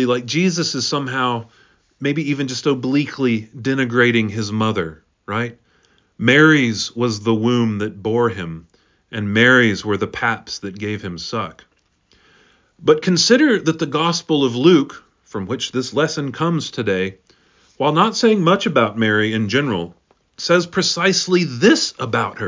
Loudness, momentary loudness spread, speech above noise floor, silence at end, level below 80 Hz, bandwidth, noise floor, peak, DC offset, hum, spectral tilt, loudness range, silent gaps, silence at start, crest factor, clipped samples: -17 LUFS; 13 LU; 42 dB; 0 s; -54 dBFS; 7.6 kHz; -59 dBFS; -2 dBFS; under 0.1%; none; -4.5 dB/octave; 4 LU; none; 0 s; 18 dB; under 0.1%